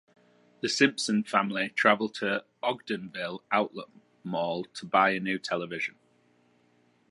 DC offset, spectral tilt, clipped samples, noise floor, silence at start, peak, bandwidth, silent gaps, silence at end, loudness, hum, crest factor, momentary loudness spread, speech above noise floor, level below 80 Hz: under 0.1%; -4 dB/octave; under 0.1%; -66 dBFS; 0.65 s; -6 dBFS; 11.5 kHz; none; 1.2 s; -28 LUFS; none; 24 dB; 12 LU; 38 dB; -76 dBFS